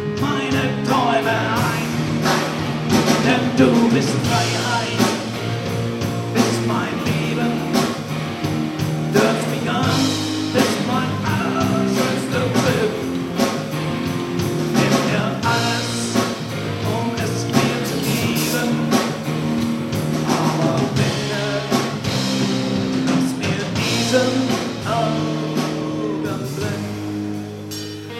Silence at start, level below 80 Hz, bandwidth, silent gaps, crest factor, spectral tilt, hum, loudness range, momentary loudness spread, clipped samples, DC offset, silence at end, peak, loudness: 0 s; -48 dBFS; 16.5 kHz; none; 18 dB; -5 dB/octave; none; 3 LU; 7 LU; under 0.1%; under 0.1%; 0 s; -2 dBFS; -20 LUFS